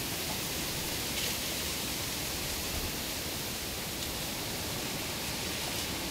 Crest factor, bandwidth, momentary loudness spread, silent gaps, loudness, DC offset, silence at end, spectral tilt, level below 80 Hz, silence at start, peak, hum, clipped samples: 16 dB; 16 kHz; 3 LU; none; -33 LUFS; under 0.1%; 0 s; -2 dB/octave; -50 dBFS; 0 s; -20 dBFS; none; under 0.1%